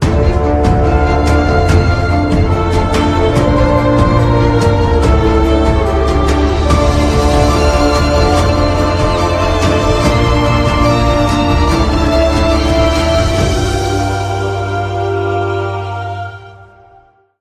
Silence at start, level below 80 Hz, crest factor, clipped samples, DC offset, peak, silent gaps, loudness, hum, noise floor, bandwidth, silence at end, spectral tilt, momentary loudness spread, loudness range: 0 s; -16 dBFS; 12 dB; under 0.1%; under 0.1%; 0 dBFS; none; -12 LUFS; none; -46 dBFS; 14 kHz; 0.75 s; -6.5 dB/octave; 5 LU; 4 LU